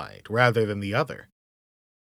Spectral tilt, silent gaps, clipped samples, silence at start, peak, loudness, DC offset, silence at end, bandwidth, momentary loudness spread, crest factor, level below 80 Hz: -6.5 dB/octave; none; under 0.1%; 0 s; -4 dBFS; -24 LUFS; under 0.1%; 0.95 s; 15 kHz; 11 LU; 22 dB; -66 dBFS